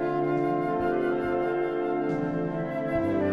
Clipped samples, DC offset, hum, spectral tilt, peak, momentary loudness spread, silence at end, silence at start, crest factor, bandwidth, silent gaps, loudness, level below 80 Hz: under 0.1%; under 0.1%; none; -9 dB/octave; -14 dBFS; 3 LU; 0 s; 0 s; 12 dB; 6 kHz; none; -27 LUFS; -54 dBFS